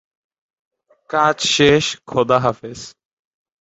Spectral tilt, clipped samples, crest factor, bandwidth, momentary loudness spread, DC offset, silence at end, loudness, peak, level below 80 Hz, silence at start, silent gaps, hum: -4 dB/octave; under 0.1%; 18 dB; 8.2 kHz; 20 LU; under 0.1%; 0.75 s; -16 LUFS; 0 dBFS; -50 dBFS; 1.1 s; none; none